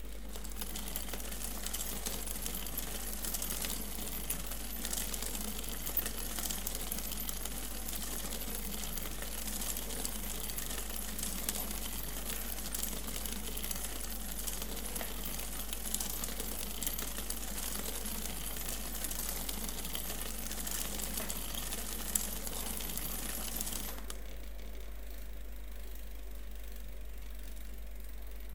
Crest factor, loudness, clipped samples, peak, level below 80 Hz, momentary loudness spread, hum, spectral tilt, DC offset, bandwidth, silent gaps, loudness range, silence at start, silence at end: 30 dB; -38 LUFS; under 0.1%; -10 dBFS; -46 dBFS; 12 LU; none; -2 dB/octave; 0.7%; 19 kHz; none; 5 LU; 0 s; 0 s